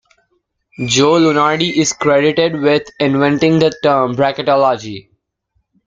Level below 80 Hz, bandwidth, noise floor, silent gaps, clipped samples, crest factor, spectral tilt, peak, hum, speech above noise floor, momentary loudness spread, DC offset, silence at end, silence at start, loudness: -52 dBFS; 9.4 kHz; -66 dBFS; none; under 0.1%; 14 dB; -4.5 dB/octave; -2 dBFS; none; 52 dB; 5 LU; under 0.1%; 0.85 s; 0.8 s; -13 LUFS